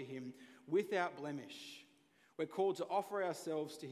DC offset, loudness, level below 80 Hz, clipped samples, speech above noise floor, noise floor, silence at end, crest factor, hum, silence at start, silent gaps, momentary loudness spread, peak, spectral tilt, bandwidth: under 0.1%; -40 LUFS; under -90 dBFS; under 0.1%; 32 dB; -71 dBFS; 0 s; 18 dB; none; 0 s; none; 16 LU; -22 dBFS; -5 dB/octave; 15.5 kHz